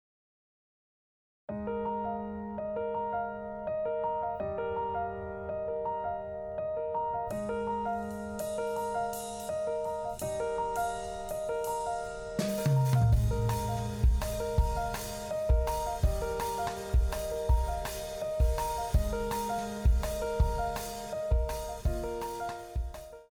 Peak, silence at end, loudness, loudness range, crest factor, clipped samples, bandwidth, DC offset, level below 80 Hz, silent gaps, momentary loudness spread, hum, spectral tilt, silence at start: -16 dBFS; 0.05 s; -33 LUFS; 5 LU; 16 dB; under 0.1%; over 20 kHz; under 0.1%; -36 dBFS; none; 8 LU; none; -6 dB/octave; 1.5 s